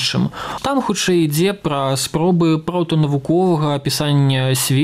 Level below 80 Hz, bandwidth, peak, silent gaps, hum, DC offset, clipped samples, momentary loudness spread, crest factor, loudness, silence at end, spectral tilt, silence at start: -48 dBFS; 16 kHz; -6 dBFS; none; none; under 0.1%; under 0.1%; 4 LU; 10 dB; -17 LUFS; 0 s; -5 dB/octave; 0 s